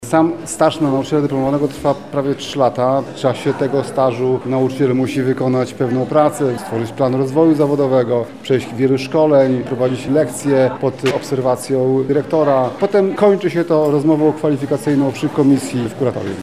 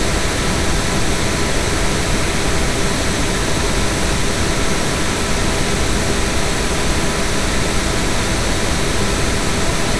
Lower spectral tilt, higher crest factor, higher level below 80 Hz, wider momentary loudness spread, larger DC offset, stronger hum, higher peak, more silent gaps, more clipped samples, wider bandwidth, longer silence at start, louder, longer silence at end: first, -6.5 dB/octave vs -3.5 dB/octave; about the same, 14 dB vs 14 dB; second, -54 dBFS vs -24 dBFS; first, 6 LU vs 0 LU; second, 0.4% vs 7%; neither; first, 0 dBFS vs -4 dBFS; neither; neither; first, 14.5 kHz vs 11 kHz; about the same, 0 s vs 0 s; about the same, -16 LUFS vs -18 LUFS; about the same, 0 s vs 0 s